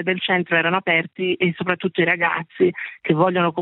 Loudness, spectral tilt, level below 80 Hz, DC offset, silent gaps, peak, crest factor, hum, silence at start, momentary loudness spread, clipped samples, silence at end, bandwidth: -20 LUFS; -10 dB/octave; -68 dBFS; under 0.1%; none; -4 dBFS; 18 dB; none; 0 s; 5 LU; under 0.1%; 0 s; 4.1 kHz